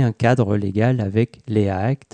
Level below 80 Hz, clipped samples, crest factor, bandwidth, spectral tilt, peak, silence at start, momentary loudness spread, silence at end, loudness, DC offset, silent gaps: -54 dBFS; under 0.1%; 14 dB; 9 kHz; -8.5 dB/octave; -4 dBFS; 0 s; 4 LU; 0.2 s; -20 LUFS; under 0.1%; none